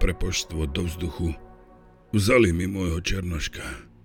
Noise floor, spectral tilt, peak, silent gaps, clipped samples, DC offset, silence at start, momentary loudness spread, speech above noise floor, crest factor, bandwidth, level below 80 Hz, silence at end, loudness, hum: -51 dBFS; -5 dB/octave; -6 dBFS; none; under 0.1%; under 0.1%; 0 s; 12 LU; 27 dB; 20 dB; 18 kHz; -32 dBFS; 0.2 s; -25 LUFS; none